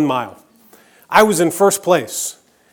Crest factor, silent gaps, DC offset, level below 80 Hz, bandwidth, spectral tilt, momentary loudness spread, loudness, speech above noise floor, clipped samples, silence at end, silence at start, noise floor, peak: 18 dB; none; under 0.1%; -58 dBFS; over 20 kHz; -3.5 dB/octave; 11 LU; -16 LUFS; 34 dB; under 0.1%; 0.4 s; 0 s; -49 dBFS; 0 dBFS